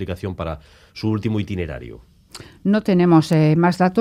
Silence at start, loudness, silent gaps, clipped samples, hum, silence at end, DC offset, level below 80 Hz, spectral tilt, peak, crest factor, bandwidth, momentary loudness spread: 0 s; -19 LUFS; none; under 0.1%; none; 0 s; under 0.1%; -46 dBFS; -8 dB/octave; -2 dBFS; 18 dB; 13.5 kHz; 23 LU